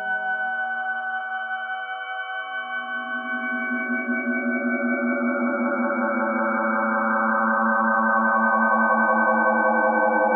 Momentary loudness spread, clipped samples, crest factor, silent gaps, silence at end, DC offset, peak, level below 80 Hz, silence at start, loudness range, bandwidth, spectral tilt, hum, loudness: 9 LU; under 0.1%; 16 dB; none; 0 s; under 0.1%; -8 dBFS; under -90 dBFS; 0 s; 8 LU; 3.2 kHz; -3 dB/octave; none; -22 LUFS